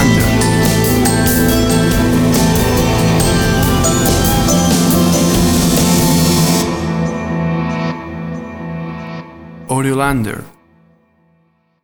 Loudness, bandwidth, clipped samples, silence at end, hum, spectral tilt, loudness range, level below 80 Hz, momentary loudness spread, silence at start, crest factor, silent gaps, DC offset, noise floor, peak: -13 LUFS; over 20 kHz; under 0.1%; 1.35 s; none; -5 dB/octave; 9 LU; -26 dBFS; 13 LU; 0 s; 14 dB; none; under 0.1%; -57 dBFS; 0 dBFS